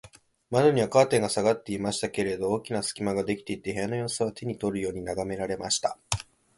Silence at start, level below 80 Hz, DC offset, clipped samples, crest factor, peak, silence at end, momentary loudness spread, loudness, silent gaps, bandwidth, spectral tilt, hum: 0.05 s; -54 dBFS; under 0.1%; under 0.1%; 24 dB; -4 dBFS; 0.35 s; 10 LU; -27 LUFS; none; 11.5 kHz; -4.5 dB/octave; none